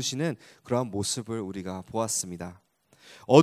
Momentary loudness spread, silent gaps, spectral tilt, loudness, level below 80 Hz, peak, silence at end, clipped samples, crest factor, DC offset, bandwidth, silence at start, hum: 13 LU; none; -4.5 dB/octave; -29 LUFS; -58 dBFS; -2 dBFS; 0 s; under 0.1%; 26 dB; under 0.1%; 16 kHz; 0 s; none